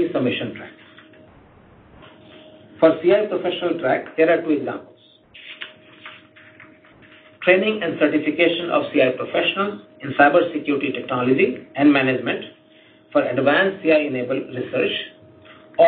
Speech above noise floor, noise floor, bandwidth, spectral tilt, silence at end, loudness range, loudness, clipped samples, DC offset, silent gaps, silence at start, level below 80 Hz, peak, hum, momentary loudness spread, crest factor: 32 dB; -51 dBFS; 4.5 kHz; -10 dB/octave; 0 s; 5 LU; -20 LUFS; under 0.1%; under 0.1%; none; 0 s; -64 dBFS; 0 dBFS; none; 19 LU; 20 dB